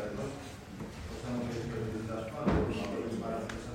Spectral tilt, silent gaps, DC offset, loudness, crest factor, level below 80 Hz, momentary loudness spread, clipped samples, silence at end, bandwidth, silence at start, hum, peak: -6.5 dB/octave; none; under 0.1%; -37 LUFS; 18 dB; -48 dBFS; 12 LU; under 0.1%; 0 s; 16 kHz; 0 s; none; -18 dBFS